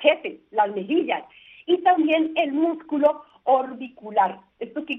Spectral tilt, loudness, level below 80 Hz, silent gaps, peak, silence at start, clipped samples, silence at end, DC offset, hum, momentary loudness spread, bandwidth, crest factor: -7 dB/octave; -23 LUFS; -72 dBFS; none; -4 dBFS; 0 s; under 0.1%; 0 s; under 0.1%; none; 14 LU; 3.9 kHz; 20 dB